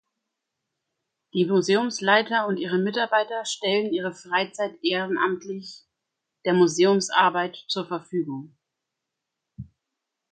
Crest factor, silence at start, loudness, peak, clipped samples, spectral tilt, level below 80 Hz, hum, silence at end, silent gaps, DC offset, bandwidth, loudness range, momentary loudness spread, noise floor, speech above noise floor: 22 dB; 1.35 s; -24 LUFS; -4 dBFS; under 0.1%; -4 dB/octave; -68 dBFS; none; 0.7 s; none; under 0.1%; 9.4 kHz; 4 LU; 12 LU; -84 dBFS; 60 dB